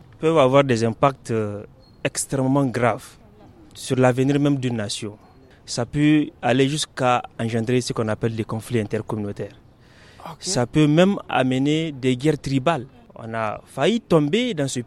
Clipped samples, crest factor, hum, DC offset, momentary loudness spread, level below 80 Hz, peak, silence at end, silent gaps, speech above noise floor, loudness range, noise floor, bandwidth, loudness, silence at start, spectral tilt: under 0.1%; 20 dB; none; under 0.1%; 12 LU; -52 dBFS; -2 dBFS; 0 s; none; 29 dB; 3 LU; -49 dBFS; 13 kHz; -21 LUFS; 0.2 s; -5.5 dB/octave